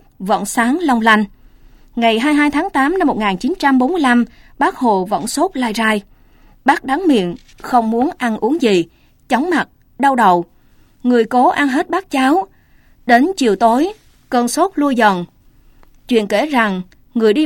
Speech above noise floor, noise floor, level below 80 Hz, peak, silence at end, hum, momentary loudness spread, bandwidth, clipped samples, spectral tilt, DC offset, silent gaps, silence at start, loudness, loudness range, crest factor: 34 dB; -49 dBFS; -46 dBFS; 0 dBFS; 0 s; none; 9 LU; 16.5 kHz; under 0.1%; -4.5 dB/octave; under 0.1%; none; 0.2 s; -15 LUFS; 2 LU; 16 dB